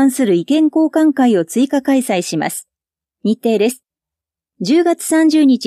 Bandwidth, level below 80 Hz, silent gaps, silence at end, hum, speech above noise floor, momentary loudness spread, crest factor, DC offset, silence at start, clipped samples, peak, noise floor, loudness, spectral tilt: 15 kHz; -70 dBFS; none; 0 s; none; 74 dB; 9 LU; 12 dB; under 0.1%; 0 s; under 0.1%; -4 dBFS; -87 dBFS; -15 LUFS; -5 dB/octave